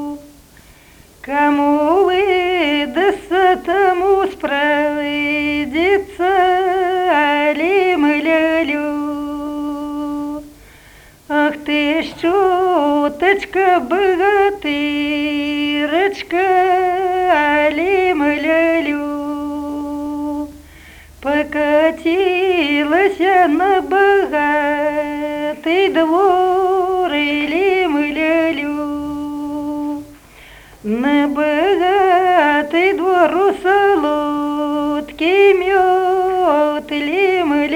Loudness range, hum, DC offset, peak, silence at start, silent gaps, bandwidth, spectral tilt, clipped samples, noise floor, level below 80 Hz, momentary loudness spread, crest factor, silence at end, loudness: 5 LU; none; under 0.1%; 0 dBFS; 0 s; none; 18.5 kHz; -4.5 dB/octave; under 0.1%; -45 dBFS; -46 dBFS; 10 LU; 14 dB; 0 s; -15 LUFS